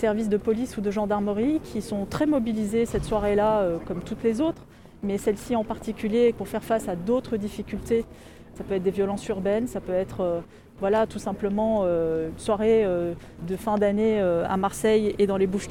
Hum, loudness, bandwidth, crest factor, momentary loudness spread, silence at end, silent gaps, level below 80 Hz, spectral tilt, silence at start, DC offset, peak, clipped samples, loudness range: none; -25 LUFS; 16.5 kHz; 14 dB; 9 LU; 0 s; none; -46 dBFS; -6.5 dB/octave; 0 s; under 0.1%; -10 dBFS; under 0.1%; 4 LU